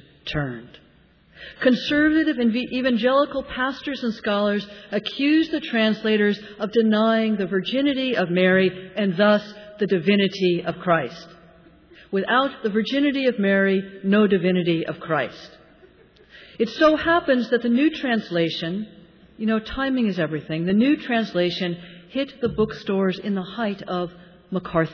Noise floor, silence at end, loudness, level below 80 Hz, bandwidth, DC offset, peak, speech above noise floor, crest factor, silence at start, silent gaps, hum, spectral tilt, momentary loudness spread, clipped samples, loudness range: -55 dBFS; 0 s; -22 LUFS; -52 dBFS; 5.4 kHz; under 0.1%; -6 dBFS; 33 dB; 16 dB; 0.25 s; none; none; -7 dB/octave; 10 LU; under 0.1%; 3 LU